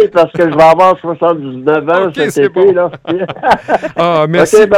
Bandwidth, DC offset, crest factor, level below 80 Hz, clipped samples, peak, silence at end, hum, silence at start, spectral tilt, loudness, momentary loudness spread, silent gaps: 15.5 kHz; under 0.1%; 10 dB; -48 dBFS; 0.6%; 0 dBFS; 0 s; none; 0 s; -5.5 dB/octave; -10 LUFS; 8 LU; none